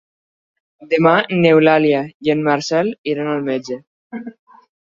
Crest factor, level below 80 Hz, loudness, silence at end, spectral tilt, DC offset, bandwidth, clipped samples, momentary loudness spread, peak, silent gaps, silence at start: 16 dB; -62 dBFS; -16 LUFS; 0.55 s; -6 dB/octave; under 0.1%; 7.6 kHz; under 0.1%; 20 LU; -2 dBFS; 2.14-2.20 s, 2.98-3.04 s, 3.87-4.10 s; 0.8 s